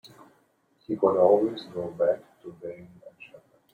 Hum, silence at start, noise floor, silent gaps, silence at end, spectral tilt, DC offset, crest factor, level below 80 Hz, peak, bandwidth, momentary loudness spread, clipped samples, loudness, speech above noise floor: none; 0.9 s; -67 dBFS; none; 0.65 s; -8 dB/octave; under 0.1%; 20 dB; -72 dBFS; -8 dBFS; 7 kHz; 26 LU; under 0.1%; -25 LUFS; 41 dB